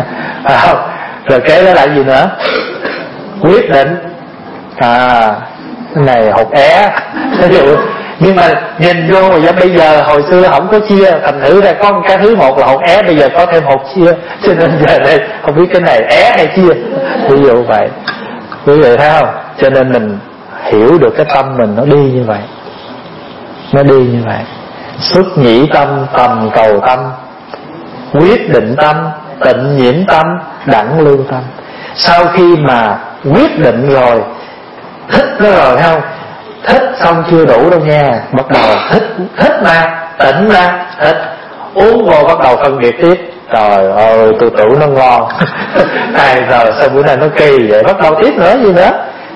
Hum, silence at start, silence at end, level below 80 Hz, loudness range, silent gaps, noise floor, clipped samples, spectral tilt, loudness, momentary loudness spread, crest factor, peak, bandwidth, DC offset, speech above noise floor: none; 0 s; 0 s; -38 dBFS; 4 LU; none; -28 dBFS; 2%; -7.5 dB/octave; -7 LUFS; 14 LU; 8 dB; 0 dBFS; 11 kHz; under 0.1%; 22 dB